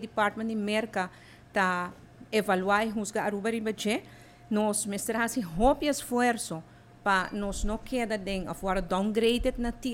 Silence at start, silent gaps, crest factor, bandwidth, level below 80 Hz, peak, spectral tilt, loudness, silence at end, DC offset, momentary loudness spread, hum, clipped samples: 0 s; none; 18 dB; 17 kHz; -44 dBFS; -10 dBFS; -4 dB/octave; -29 LUFS; 0 s; under 0.1%; 8 LU; none; under 0.1%